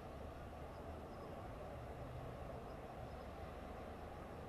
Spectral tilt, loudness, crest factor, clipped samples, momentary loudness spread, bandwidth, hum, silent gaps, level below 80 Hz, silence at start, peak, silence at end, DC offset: -7 dB/octave; -52 LUFS; 12 dB; under 0.1%; 2 LU; 13 kHz; none; none; -58 dBFS; 0 s; -38 dBFS; 0 s; under 0.1%